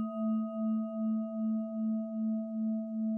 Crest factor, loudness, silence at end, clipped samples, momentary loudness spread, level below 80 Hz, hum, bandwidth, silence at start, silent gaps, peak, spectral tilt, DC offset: 8 dB; -34 LUFS; 0 s; under 0.1%; 1 LU; under -90 dBFS; none; 3 kHz; 0 s; none; -26 dBFS; -12.5 dB/octave; under 0.1%